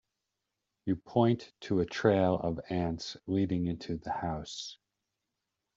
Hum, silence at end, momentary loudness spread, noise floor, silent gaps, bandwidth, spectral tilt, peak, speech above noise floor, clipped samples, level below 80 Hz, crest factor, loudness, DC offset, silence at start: none; 1 s; 11 LU; -86 dBFS; none; 7.8 kHz; -6.5 dB/octave; -12 dBFS; 55 dB; under 0.1%; -58 dBFS; 22 dB; -32 LUFS; under 0.1%; 0.85 s